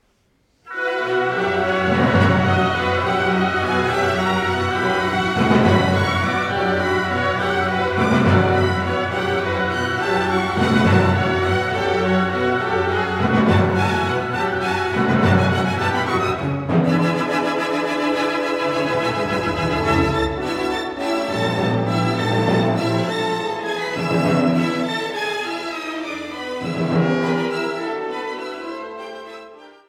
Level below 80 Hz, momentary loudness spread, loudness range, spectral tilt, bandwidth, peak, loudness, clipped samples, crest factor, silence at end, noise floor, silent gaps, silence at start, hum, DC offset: -44 dBFS; 9 LU; 4 LU; -6 dB/octave; 15 kHz; -2 dBFS; -19 LUFS; under 0.1%; 18 dB; 0.2 s; -62 dBFS; none; 0.65 s; none; under 0.1%